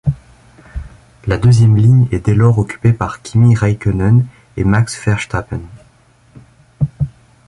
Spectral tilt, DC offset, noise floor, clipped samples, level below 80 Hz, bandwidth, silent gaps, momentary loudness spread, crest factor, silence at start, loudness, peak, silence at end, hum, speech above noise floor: -7.5 dB/octave; under 0.1%; -49 dBFS; under 0.1%; -32 dBFS; 11 kHz; none; 17 LU; 14 dB; 0.05 s; -14 LUFS; 0 dBFS; 0.4 s; none; 37 dB